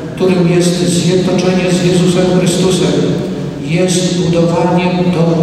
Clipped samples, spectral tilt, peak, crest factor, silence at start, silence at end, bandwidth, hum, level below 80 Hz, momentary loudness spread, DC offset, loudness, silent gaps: under 0.1%; -5.5 dB/octave; -2 dBFS; 10 dB; 0 s; 0 s; 13.5 kHz; none; -40 dBFS; 4 LU; under 0.1%; -12 LUFS; none